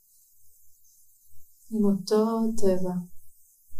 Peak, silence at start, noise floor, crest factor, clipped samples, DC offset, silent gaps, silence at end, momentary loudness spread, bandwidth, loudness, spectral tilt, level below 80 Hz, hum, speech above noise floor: -10 dBFS; 0.65 s; -57 dBFS; 16 dB; under 0.1%; under 0.1%; none; 0 s; 11 LU; 15.5 kHz; -26 LUFS; -7 dB/octave; -52 dBFS; none; 34 dB